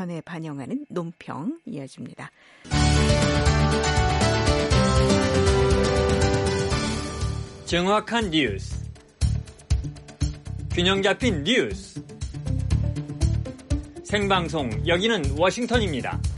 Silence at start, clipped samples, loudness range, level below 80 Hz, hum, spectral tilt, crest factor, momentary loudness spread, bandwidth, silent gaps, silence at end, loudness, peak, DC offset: 0 s; under 0.1%; 5 LU; -30 dBFS; none; -5 dB/octave; 16 dB; 14 LU; 11.5 kHz; none; 0 s; -23 LUFS; -6 dBFS; under 0.1%